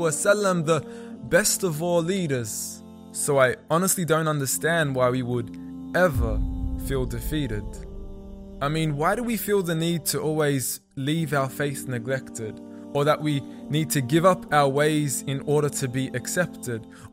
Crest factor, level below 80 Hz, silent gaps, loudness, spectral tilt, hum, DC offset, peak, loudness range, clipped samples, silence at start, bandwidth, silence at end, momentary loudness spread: 20 dB; -40 dBFS; none; -24 LUFS; -4.5 dB/octave; none; under 0.1%; -6 dBFS; 4 LU; under 0.1%; 0 s; 16 kHz; 0.05 s; 14 LU